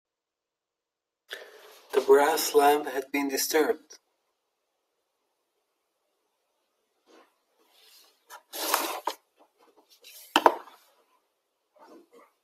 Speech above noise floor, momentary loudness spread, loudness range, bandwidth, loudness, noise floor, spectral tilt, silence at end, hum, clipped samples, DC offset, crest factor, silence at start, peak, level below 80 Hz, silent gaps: 64 dB; 22 LU; 10 LU; 16 kHz; -25 LUFS; -88 dBFS; -1 dB/octave; 1.8 s; none; under 0.1%; under 0.1%; 28 dB; 1.3 s; -2 dBFS; -80 dBFS; none